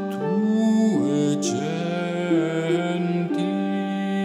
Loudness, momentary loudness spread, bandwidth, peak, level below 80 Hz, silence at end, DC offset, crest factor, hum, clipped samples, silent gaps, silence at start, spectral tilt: -23 LUFS; 6 LU; 12 kHz; -10 dBFS; -74 dBFS; 0 s; under 0.1%; 12 dB; none; under 0.1%; none; 0 s; -6 dB/octave